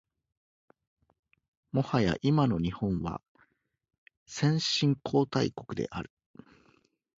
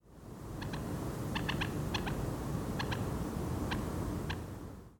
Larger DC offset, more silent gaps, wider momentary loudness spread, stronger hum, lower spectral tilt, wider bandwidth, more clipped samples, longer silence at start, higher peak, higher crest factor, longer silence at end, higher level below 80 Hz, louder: neither; first, 3.29-3.35 s, 3.98-4.06 s, 4.17-4.26 s vs none; first, 12 LU vs 9 LU; neither; about the same, -6 dB/octave vs -5.5 dB/octave; second, 7.8 kHz vs 18 kHz; neither; first, 1.75 s vs 0.05 s; first, -12 dBFS vs -20 dBFS; about the same, 20 dB vs 18 dB; first, 1.15 s vs 0.05 s; second, -54 dBFS vs -48 dBFS; first, -29 LUFS vs -38 LUFS